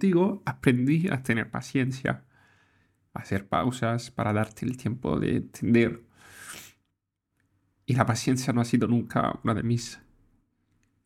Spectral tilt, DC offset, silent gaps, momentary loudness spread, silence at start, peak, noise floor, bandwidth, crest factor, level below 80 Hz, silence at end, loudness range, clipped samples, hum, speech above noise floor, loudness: -6.5 dB/octave; under 0.1%; none; 18 LU; 0 s; -4 dBFS; -80 dBFS; 15 kHz; 22 dB; -56 dBFS; 1.1 s; 3 LU; under 0.1%; none; 54 dB; -27 LUFS